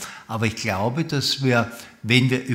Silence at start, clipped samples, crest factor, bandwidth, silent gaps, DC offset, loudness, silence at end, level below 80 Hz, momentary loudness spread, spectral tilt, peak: 0 s; under 0.1%; 20 dB; 16 kHz; none; under 0.1%; -22 LUFS; 0 s; -58 dBFS; 12 LU; -5 dB/octave; -2 dBFS